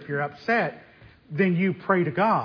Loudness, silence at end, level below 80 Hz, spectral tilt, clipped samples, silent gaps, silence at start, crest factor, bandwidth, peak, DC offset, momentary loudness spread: -24 LUFS; 0 s; -66 dBFS; -9 dB/octave; under 0.1%; none; 0 s; 18 dB; 5.4 kHz; -8 dBFS; under 0.1%; 8 LU